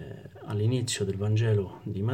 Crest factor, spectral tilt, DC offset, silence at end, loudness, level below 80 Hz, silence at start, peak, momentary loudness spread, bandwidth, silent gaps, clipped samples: 12 dB; -6 dB/octave; under 0.1%; 0 s; -29 LUFS; -62 dBFS; 0 s; -16 dBFS; 12 LU; 14 kHz; none; under 0.1%